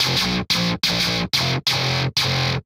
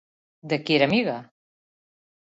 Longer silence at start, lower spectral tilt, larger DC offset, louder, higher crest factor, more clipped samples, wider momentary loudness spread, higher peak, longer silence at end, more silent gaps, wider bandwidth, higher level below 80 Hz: second, 0 s vs 0.45 s; second, -3.5 dB/octave vs -6.5 dB/octave; neither; first, -19 LUFS vs -23 LUFS; second, 14 dB vs 22 dB; neither; second, 1 LU vs 10 LU; about the same, -6 dBFS vs -6 dBFS; second, 0.05 s vs 1.15 s; neither; first, 16.5 kHz vs 8 kHz; first, -44 dBFS vs -66 dBFS